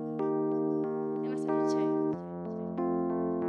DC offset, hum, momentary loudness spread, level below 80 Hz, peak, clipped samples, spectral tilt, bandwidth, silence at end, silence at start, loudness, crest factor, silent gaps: under 0.1%; none; 7 LU; -72 dBFS; -18 dBFS; under 0.1%; -8.5 dB/octave; 9 kHz; 0 s; 0 s; -32 LUFS; 12 dB; none